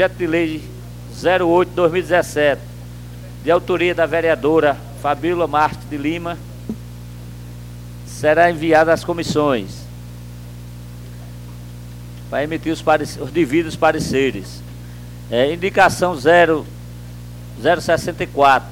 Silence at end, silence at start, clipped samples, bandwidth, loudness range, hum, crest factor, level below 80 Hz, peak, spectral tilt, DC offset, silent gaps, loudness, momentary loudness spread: 0 s; 0 s; under 0.1%; 17 kHz; 6 LU; 60 Hz at -35 dBFS; 16 dB; -40 dBFS; -2 dBFS; -5.5 dB/octave; under 0.1%; none; -17 LUFS; 21 LU